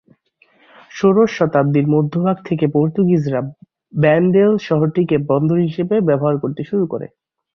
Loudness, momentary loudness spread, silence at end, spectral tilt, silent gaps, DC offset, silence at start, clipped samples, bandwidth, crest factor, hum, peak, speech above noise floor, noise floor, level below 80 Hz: -16 LUFS; 9 LU; 0.5 s; -9 dB/octave; none; under 0.1%; 0.95 s; under 0.1%; 6.6 kHz; 14 dB; none; -2 dBFS; 41 dB; -56 dBFS; -56 dBFS